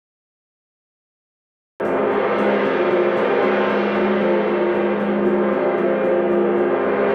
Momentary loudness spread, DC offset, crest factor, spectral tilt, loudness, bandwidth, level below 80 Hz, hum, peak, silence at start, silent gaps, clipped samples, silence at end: 2 LU; under 0.1%; 12 dB; -8 dB/octave; -19 LUFS; 5.8 kHz; -58 dBFS; none; -8 dBFS; 1.8 s; none; under 0.1%; 0 s